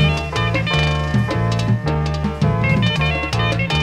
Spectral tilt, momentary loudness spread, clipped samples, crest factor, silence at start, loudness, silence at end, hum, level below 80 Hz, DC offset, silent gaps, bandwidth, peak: -6 dB/octave; 3 LU; under 0.1%; 14 dB; 0 s; -18 LUFS; 0 s; none; -28 dBFS; under 0.1%; none; 11 kHz; -4 dBFS